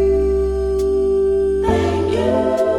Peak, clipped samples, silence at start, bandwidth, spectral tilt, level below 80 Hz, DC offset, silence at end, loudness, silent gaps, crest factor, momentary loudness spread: -4 dBFS; under 0.1%; 0 s; 10.5 kHz; -7.5 dB/octave; -28 dBFS; under 0.1%; 0 s; -17 LUFS; none; 12 dB; 2 LU